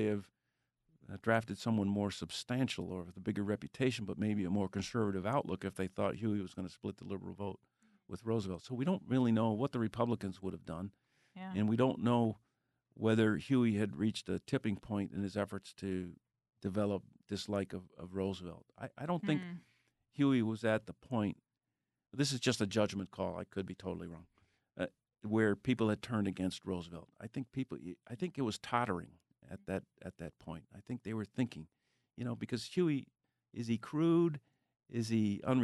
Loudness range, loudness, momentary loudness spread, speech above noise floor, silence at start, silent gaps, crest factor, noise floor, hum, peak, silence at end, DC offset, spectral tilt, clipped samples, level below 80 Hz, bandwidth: 6 LU; -37 LUFS; 16 LU; 54 dB; 0 s; none; 20 dB; -90 dBFS; none; -16 dBFS; 0 s; under 0.1%; -6.5 dB/octave; under 0.1%; -70 dBFS; 12 kHz